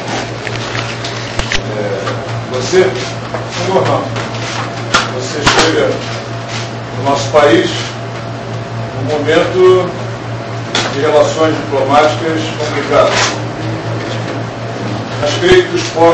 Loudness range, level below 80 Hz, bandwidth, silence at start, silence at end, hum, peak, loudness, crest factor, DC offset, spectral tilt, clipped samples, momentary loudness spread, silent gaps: 3 LU; -36 dBFS; 8.8 kHz; 0 s; 0 s; none; 0 dBFS; -14 LUFS; 14 dB; under 0.1%; -4.5 dB/octave; 0.1%; 12 LU; none